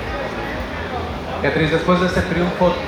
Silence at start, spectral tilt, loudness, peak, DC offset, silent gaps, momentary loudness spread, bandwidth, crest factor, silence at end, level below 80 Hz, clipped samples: 0 s; -6.5 dB/octave; -20 LUFS; -4 dBFS; under 0.1%; none; 9 LU; 14 kHz; 14 dB; 0 s; -34 dBFS; under 0.1%